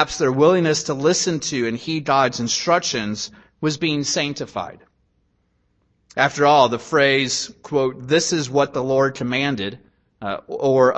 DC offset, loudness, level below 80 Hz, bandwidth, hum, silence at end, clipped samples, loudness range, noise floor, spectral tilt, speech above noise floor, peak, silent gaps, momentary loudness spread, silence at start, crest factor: under 0.1%; -19 LUFS; -56 dBFS; 8.6 kHz; none; 0 s; under 0.1%; 5 LU; -66 dBFS; -4 dB/octave; 46 dB; -2 dBFS; none; 13 LU; 0 s; 18 dB